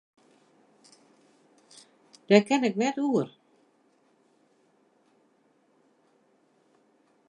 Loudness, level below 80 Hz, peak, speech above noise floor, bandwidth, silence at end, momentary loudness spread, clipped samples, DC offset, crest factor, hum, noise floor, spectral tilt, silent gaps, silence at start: -25 LUFS; -82 dBFS; -6 dBFS; 43 dB; 10.5 kHz; 4 s; 8 LU; under 0.1%; under 0.1%; 26 dB; none; -67 dBFS; -5.5 dB/octave; none; 2.3 s